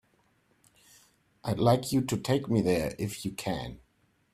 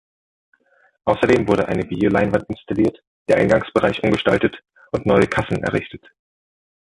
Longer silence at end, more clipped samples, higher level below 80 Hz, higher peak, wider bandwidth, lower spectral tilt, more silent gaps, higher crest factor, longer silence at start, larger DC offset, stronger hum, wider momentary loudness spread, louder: second, 0.55 s vs 1 s; neither; second, -56 dBFS vs -44 dBFS; second, -8 dBFS vs 0 dBFS; first, 16 kHz vs 11.5 kHz; about the same, -6 dB/octave vs -7 dB/octave; second, none vs 3.07-3.26 s; about the same, 22 dB vs 20 dB; first, 1.45 s vs 1.05 s; neither; neither; about the same, 10 LU vs 9 LU; second, -29 LUFS vs -19 LUFS